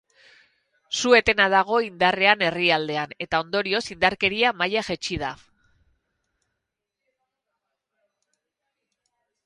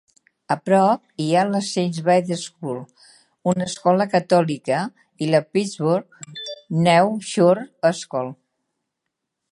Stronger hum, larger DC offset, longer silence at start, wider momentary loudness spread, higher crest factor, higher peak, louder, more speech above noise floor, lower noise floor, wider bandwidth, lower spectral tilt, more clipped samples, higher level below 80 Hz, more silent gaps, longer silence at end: neither; neither; first, 0.9 s vs 0.5 s; about the same, 11 LU vs 13 LU; about the same, 24 dB vs 20 dB; about the same, -2 dBFS vs -2 dBFS; about the same, -21 LUFS vs -20 LUFS; about the same, 61 dB vs 60 dB; about the same, -83 dBFS vs -80 dBFS; about the same, 11.5 kHz vs 11.5 kHz; second, -3 dB/octave vs -5.5 dB/octave; neither; first, -54 dBFS vs -68 dBFS; neither; first, 4.1 s vs 1.2 s